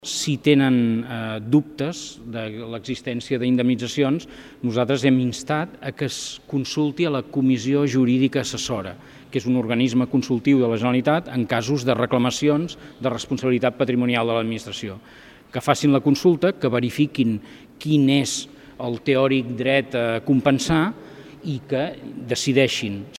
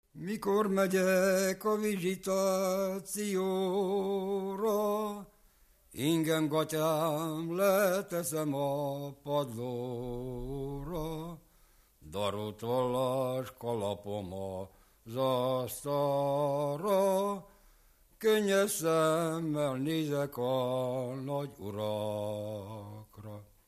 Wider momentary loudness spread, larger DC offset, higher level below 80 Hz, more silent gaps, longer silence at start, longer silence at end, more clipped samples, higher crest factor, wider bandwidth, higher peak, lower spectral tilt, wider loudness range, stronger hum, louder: about the same, 12 LU vs 12 LU; neither; about the same, -56 dBFS vs -60 dBFS; neither; about the same, 0.05 s vs 0.15 s; second, 0 s vs 0.25 s; neither; about the same, 22 dB vs 18 dB; about the same, 14.5 kHz vs 15 kHz; first, 0 dBFS vs -14 dBFS; about the same, -5.5 dB/octave vs -5 dB/octave; second, 3 LU vs 6 LU; neither; first, -22 LUFS vs -32 LUFS